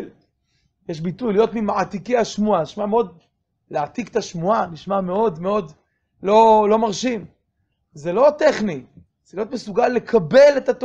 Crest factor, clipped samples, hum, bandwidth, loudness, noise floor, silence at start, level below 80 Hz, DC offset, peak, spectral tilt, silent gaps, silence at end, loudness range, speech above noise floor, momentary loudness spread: 18 dB; under 0.1%; none; 8 kHz; -19 LUFS; -71 dBFS; 0 s; -54 dBFS; under 0.1%; -2 dBFS; -5.5 dB/octave; none; 0 s; 4 LU; 52 dB; 16 LU